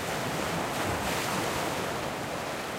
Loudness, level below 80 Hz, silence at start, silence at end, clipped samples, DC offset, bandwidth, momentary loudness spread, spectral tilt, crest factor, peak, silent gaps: -31 LUFS; -52 dBFS; 0 s; 0 s; under 0.1%; under 0.1%; 16 kHz; 4 LU; -3.5 dB/octave; 14 dB; -18 dBFS; none